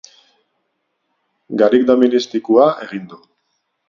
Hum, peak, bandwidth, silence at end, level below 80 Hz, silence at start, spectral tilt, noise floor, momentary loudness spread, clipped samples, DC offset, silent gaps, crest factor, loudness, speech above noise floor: none; 0 dBFS; 7.2 kHz; 0.75 s; -62 dBFS; 1.5 s; -6 dB/octave; -71 dBFS; 15 LU; under 0.1%; under 0.1%; none; 18 dB; -14 LUFS; 56 dB